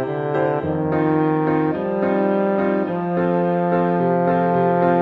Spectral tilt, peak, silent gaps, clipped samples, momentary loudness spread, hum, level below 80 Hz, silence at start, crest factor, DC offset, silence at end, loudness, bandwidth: -10.5 dB/octave; -4 dBFS; none; under 0.1%; 4 LU; none; -54 dBFS; 0 s; 14 dB; under 0.1%; 0 s; -19 LUFS; 4.6 kHz